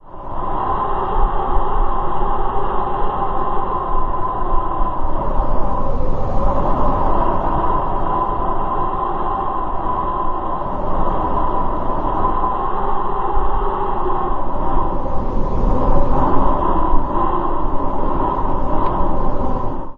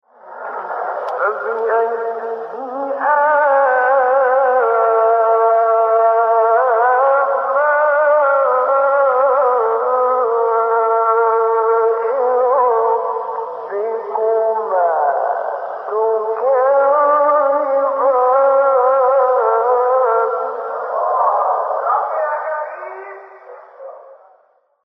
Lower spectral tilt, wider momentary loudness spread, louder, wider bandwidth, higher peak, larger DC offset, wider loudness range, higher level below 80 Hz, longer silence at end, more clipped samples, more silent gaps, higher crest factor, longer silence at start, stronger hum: first, -9.5 dB/octave vs -5 dB/octave; second, 4 LU vs 10 LU; second, -21 LUFS vs -15 LUFS; second, 3.6 kHz vs 5.2 kHz; first, 0 dBFS vs -4 dBFS; neither; second, 2 LU vs 5 LU; first, -20 dBFS vs under -90 dBFS; second, 0.05 s vs 0.7 s; neither; neither; about the same, 14 dB vs 12 dB; second, 0.05 s vs 0.25 s; neither